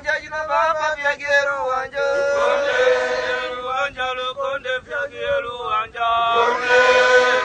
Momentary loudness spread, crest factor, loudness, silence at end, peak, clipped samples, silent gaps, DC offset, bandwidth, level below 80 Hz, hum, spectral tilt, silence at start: 10 LU; 16 dB; -19 LUFS; 0 s; -2 dBFS; under 0.1%; none; under 0.1%; 9.2 kHz; -52 dBFS; none; -1.5 dB/octave; 0 s